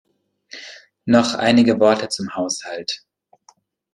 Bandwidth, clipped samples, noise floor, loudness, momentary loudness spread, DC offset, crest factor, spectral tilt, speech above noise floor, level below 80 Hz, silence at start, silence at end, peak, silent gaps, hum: 11 kHz; under 0.1%; -56 dBFS; -18 LUFS; 21 LU; under 0.1%; 18 dB; -4.5 dB/octave; 39 dB; -60 dBFS; 0.55 s; 0.95 s; -2 dBFS; none; none